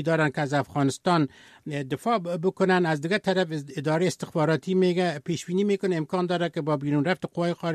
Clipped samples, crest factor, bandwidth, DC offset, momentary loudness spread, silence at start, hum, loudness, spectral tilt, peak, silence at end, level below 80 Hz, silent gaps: under 0.1%; 16 dB; 13.5 kHz; under 0.1%; 7 LU; 0 s; none; -26 LUFS; -6 dB/octave; -10 dBFS; 0 s; -68 dBFS; none